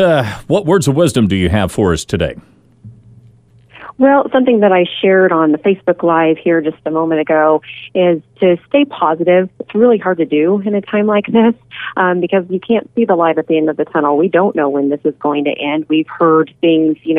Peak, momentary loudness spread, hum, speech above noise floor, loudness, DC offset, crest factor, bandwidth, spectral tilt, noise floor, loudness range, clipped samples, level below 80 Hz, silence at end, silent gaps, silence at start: 0 dBFS; 5 LU; none; 33 dB; -13 LUFS; under 0.1%; 12 dB; 14.5 kHz; -6.5 dB/octave; -45 dBFS; 3 LU; under 0.1%; -42 dBFS; 0 s; none; 0 s